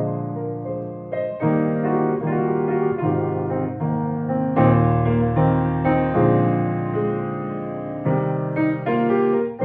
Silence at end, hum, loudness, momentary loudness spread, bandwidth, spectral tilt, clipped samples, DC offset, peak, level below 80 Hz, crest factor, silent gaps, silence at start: 0 s; none; -21 LUFS; 10 LU; 4 kHz; -12 dB/octave; under 0.1%; under 0.1%; -2 dBFS; -44 dBFS; 18 dB; none; 0 s